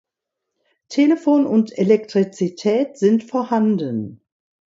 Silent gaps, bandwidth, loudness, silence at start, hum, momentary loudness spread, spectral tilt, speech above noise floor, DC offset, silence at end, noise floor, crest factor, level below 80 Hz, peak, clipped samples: none; 7.8 kHz; -19 LUFS; 0.9 s; none; 8 LU; -7 dB/octave; 64 dB; under 0.1%; 0.5 s; -81 dBFS; 16 dB; -68 dBFS; -2 dBFS; under 0.1%